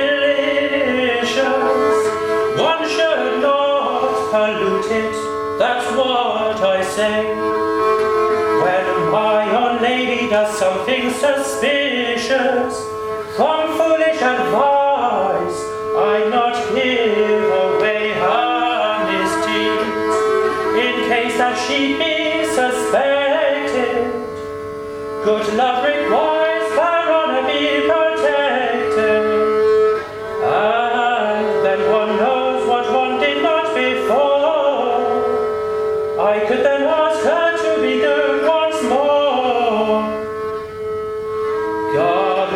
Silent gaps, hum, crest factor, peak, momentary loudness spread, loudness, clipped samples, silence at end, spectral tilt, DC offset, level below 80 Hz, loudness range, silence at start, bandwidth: none; none; 14 dB; -2 dBFS; 5 LU; -17 LUFS; under 0.1%; 0 s; -4 dB/octave; under 0.1%; -54 dBFS; 2 LU; 0 s; 14.5 kHz